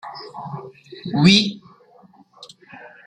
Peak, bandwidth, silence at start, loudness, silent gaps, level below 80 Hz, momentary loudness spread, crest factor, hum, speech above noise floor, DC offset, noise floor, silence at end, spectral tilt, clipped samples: -2 dBFS; 10 kHz; 0.05 s; -16 LUFS; none; -58 dBFS; 27 LU; 22 dB; none; 32 dB; under 0.1%; -51 dBFS; 0.2 s; -5 dB/octave; under 0.1%